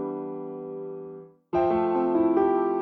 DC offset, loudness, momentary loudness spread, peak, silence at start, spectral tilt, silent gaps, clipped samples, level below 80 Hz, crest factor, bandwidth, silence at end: under 0.1%; -26 LUFS; 17 LU; -12 dBFS; 0 s; -9.5 dB/octave; none; under 0.1%; -58 dBFS; 14 dB; 4.2 kHz; 0 s